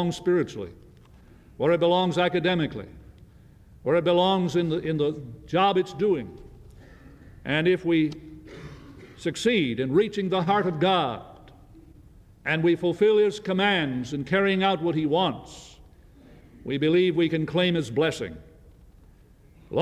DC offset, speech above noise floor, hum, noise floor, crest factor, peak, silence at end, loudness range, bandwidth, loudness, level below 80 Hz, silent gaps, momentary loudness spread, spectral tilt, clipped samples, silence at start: under 0.1%; 30 dB; none; -53 dBFS; 16 dB; -10 dBFS; 0 s; 3 LU; 12 kHz; -24 LUFS; -54 dBFS; none; 18 LU; -6 dB/octave; under 0.1%; 0 s